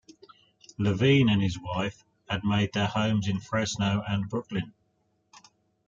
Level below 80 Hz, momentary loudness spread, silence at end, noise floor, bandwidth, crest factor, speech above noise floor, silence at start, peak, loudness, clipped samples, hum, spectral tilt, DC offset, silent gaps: -58 dBFS; 13 LU; 1.15 s; -72 dBFS; 7.6 kHz; 18 dB; 46 dB; 0.8 s; -10 dBFS; -27 LUFS; under 0.1%; none; -6 dB/octave; under 0.1%; none